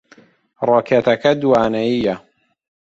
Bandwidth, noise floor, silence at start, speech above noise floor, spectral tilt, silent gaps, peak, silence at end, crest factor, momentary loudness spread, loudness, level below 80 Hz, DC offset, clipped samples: 7.6 kHz; -50 dBFS; 0.6 s; 35 dB; -6.5 dB/octave; none; -2 dBFS; 0.8 s; 16 dB; 8 LU; -16 LUFS; -54 dBFS; under 0.1%; under 0.1%